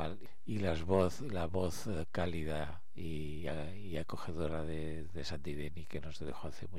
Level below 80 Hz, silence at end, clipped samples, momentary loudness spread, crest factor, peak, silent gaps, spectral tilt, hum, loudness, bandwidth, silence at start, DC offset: -52 dBFS; 0 s; under 0.1%; 12 LU; 22 dB; -18 dBFS; none; -6.5 dB/octave; none; -40 LUFS; 16 kHz; 0 s; 1%